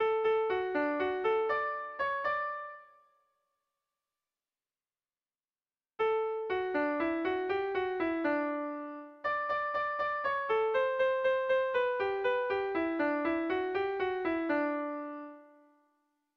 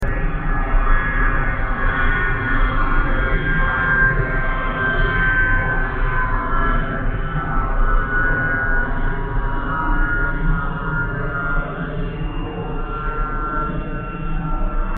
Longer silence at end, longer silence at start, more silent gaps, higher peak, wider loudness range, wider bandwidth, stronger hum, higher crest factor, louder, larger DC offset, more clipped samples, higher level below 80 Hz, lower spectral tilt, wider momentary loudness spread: first, 0.95 s vs 0 s; about the same, 0 s vs 0 s; neither; second, -20 dBFS vs -4 dBFS; about the same, 8 LU vs 6 LU; first, 6.4 kHz vs 3.8 kHz; neither; about the same, 14 dB vs 14 dB; second, -32 LUFS vs -21 LUFS; neither; neither; second, -70 dBFS vs -20 dBFS; about the same, -6 dB/octave vs -5 dB/octave; about the same, 8 LU vs 9 LU